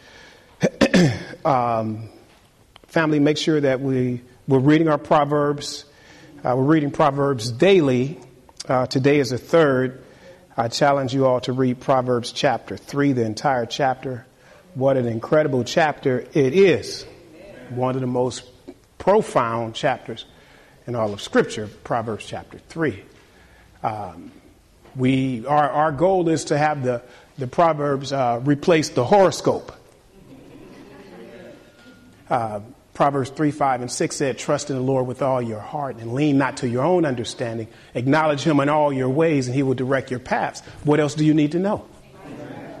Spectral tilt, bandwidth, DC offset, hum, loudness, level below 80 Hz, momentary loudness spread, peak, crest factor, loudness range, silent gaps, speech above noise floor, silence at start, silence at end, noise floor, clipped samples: -6 dB/octave; 13 kHz; under 0.1%; none; -21 LUFS; -54 dBFS; 14 LU; -4 dBFS; 16 dB; 6 LU; none; 33 dB; 0.6 s; 0 s; -53 dBFS; under 0.1%